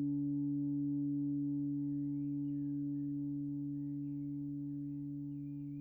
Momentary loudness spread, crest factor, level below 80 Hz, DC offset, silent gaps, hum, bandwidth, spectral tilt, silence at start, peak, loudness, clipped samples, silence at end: 6 LU; 8 dB; -70 dBFS; under 0.1%; none; none; 0.9 kHz; -13.5 dB/octave; 0 s; -30 dBFS; -39 LUFS; under 0.1%; 0 s